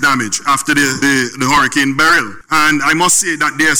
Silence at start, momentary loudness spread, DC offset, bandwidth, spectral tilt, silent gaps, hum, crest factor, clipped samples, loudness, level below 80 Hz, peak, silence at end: 0 s; 4 LU; under 0.1%; over 20 kHz; -2 dB/octave; none; none; 10 dB; under 0.1%; -12 LUFS; -44 dBFS; -4 dBFS; 0 s